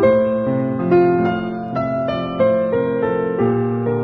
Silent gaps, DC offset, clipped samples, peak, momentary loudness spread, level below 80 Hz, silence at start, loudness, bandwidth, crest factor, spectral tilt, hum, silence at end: none; under 0.1%; under 0.1%; -4 dBFS; 7 LU; -48 dBFS; 0 s; -18 LUFS; 5 kHz; 14 dB; -10 dB/octave; none; 0 s